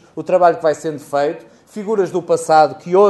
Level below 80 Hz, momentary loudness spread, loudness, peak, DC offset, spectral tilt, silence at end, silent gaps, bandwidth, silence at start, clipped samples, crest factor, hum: -66 dBFS; 13 LU; -16 LUFS; 0 dBFS; under 0.1%; -5.5 dB/octave; 0 s; none; 12 kHz; 0.15 s; under 0.1%; 16 dB; none